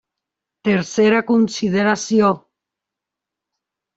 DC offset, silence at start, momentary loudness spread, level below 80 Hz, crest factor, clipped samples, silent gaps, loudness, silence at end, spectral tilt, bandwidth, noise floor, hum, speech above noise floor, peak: under 0.1%; 0.65 s; 4 LU; -60 dBFS; 16 dB; under 0.1%; none; -17 LUFS; 1.6 s; -5.5 dB/octave; 8 kHz; -85 dBFS; 50 Hz at -40 dBFS; 68 dB; -2 dBFS